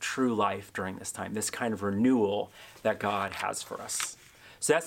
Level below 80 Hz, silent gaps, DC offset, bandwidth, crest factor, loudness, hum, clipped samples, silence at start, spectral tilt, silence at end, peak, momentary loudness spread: -70 dBFS; none; under 0.1%; 16.5 kHz; 20 dB; -31 LUFS; none; under 0.1%; 0 s; -4 dB/octave; 0 s; -10 dBFS; 10 LU